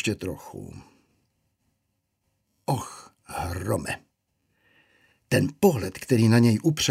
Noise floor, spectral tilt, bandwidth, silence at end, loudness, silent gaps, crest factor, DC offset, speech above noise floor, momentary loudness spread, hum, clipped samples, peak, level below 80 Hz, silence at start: -76 dBFS; -5.5 dB/octave; 16 kHz; 0 s; -24 LUFS; none; 20 dB; under 0.1%; 53 dB; 21 LU; none; under 0.1%; -6 dBFS; -54 dBFS; 0 s